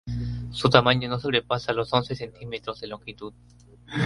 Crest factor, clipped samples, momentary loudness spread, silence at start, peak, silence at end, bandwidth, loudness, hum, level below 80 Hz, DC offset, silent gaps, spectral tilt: 26 dB; under 0.1%; 18 LU; 0.05 s; 0 dBFS; 0 s; 11.5 kHz; -25 LUFS; 60 Hz at -45 dBFS; -46 dBFS; under 0.1%; none; -6 dB/octave